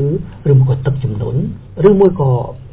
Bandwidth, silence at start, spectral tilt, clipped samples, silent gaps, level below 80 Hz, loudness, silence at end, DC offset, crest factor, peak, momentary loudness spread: 3.9 kHz; 0 s; -13.5 dB/octave; 0.1%; none; -36 dBFS; -14 LUFS; 0.05 s; under 0.1%; 14 dB; 0 dBFS; 9 LU